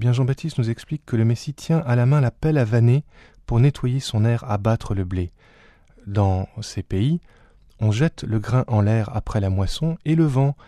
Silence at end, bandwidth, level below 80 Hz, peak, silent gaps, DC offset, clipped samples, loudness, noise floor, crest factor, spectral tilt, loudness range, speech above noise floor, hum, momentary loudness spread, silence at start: 0.15 s; 11 kHz; -40 dBFS; -6 dBFS; none; under 0.1%; under 0.1%; -22 LUFS; -51 dBFS; 16 dB; -7.5 dB/octave; 5 LU; 31 dB; none; 9 LU; 0 s